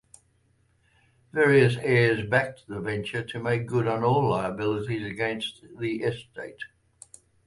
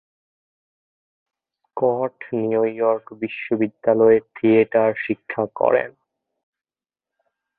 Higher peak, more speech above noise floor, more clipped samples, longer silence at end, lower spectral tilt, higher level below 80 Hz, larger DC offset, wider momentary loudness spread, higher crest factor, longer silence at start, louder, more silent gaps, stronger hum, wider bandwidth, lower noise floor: second, -8 dBFS vs -2 dBFS; second, 41 dB vs over 71 dB; neither; second, 0.8 s vs 1.7 s; second, -6.5 dB/octave vs -11.5 dB/octave; first, -58 dBFS vs -66 dBFS; neither; first, 15 LU vs 10 LU; about the same, 20 dB vs 20 dB; second, 1.35 s vs 1.75 s; second, -26 LUFS vs -20 LUFS; neither; neither; first, 11.5 kHz vs 4 kHz; second, -66 dBFS vs under -90 dBFS